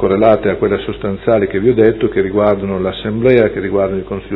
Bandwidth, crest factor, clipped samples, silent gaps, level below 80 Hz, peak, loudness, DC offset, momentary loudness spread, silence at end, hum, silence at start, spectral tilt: 4.4 kHz; 14 dB; 0.1%; none; -38 dBFS; 0 dBFS; -14 LUFS; under 0.1%; 7 LU; 0 s; none; 0 s; -10.5 dB/octave